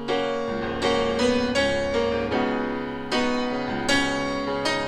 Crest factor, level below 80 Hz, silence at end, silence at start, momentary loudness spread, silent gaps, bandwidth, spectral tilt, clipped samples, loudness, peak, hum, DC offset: 16 dB; -44 dBFS; 0 s; 0 s; 5 LU; none; 13.5 kHz; -4 dB/octave; under 0.1%; -24 LUFS; -8 dBFS; none; under 0.1%